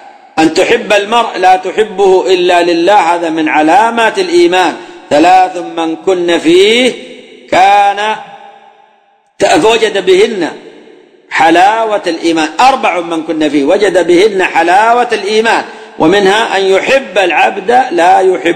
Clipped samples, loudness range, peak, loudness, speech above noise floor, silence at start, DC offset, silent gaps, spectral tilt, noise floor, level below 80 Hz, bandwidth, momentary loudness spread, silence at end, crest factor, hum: 0.5%; 2 LU; 0 dBFS; -9 LUFS; 41 dB; 0.05 s; under 0.1%; none; -3.5 dB/octave; -49 dBFS; -48 dBFS; 14.5 kHz; 7 LU; 0 s; 10 dB; none